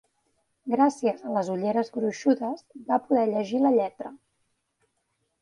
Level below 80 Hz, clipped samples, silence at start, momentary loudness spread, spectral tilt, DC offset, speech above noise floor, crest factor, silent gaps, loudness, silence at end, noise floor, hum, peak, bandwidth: -74 dBFS; under 0.1%; 0.65 s; 12 LU; -6.5 dB/octave; under 0.1%; 51 dB; 18 dB; none; -26 LUFS; 1.25 s; -76 dBFS; none; -10 dBFS; 10.5 kHz